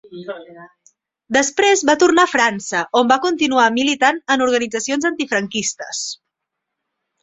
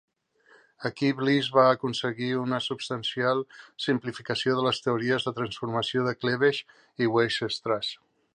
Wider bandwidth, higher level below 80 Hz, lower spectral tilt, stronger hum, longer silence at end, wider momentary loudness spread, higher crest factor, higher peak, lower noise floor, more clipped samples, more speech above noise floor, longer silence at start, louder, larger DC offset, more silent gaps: second, 8.4 kHz vs 10 kHz; first, -60 dBFS vs -68 dBFS; second, -2 dB/octave vs -5.5 dB/octave; neither; first, 1.05 s vs 0.4 s; first, 13 LU vs 10 LU; about the same, 18 dB vs 20 dB; first, -2 dBFS vs -8 dBFS; first, -79 dBFS vs -61 dBFS; neither; first, 62 dB vs 34 dB; second, 0.1 s vs 0.8 s; first, -16 LUFS vs -27 LUFS; neither; neither